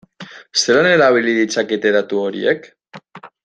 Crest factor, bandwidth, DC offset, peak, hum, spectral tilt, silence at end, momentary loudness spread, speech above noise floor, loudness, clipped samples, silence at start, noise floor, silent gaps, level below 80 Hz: 16 dB; 9.4 kHz; under 0.1%; -2 dBFS; none; -3.5 dB/octave; 0.15 s; 11 LU; 24 dB; -15 LUFS; under 0.1%; 0.2 s; -39 dBFS; none; -64 dBFS